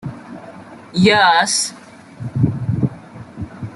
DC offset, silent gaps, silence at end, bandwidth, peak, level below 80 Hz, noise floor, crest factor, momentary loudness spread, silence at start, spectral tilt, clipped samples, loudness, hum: under 0.1%; none; 0 s; 12.5 kHz; -2 dBFS; -48 dBFS; -37 dBFS; 18 dB; 25 LU; 0.05 s; -4 dB/octave; under 0.1%; -16 LUFS; none